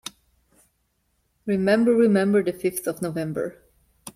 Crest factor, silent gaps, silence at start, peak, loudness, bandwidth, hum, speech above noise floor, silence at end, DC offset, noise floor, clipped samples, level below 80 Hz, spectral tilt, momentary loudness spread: 18 dB; none; 1.45 s; -6 dBFS; -22 LUFS; 15.5 kHz; none; 49 dB; 0.05 s; under 0.1%; -71 dBFS; under 0.1%; -62 dBFS; -6 dB/octave; 17 LU